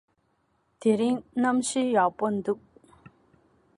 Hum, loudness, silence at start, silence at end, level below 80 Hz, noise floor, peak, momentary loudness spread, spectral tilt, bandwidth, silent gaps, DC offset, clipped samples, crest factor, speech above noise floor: none; -26 LUFS; 0.8 s; 1.2 s; -70 dBFS; -71 dBFS; -10 dBFS; 6 LU; -4.5 dB/octave; 11.5 kHz; none; under 0.1%; under 0.1%; 18 dB; 46 dB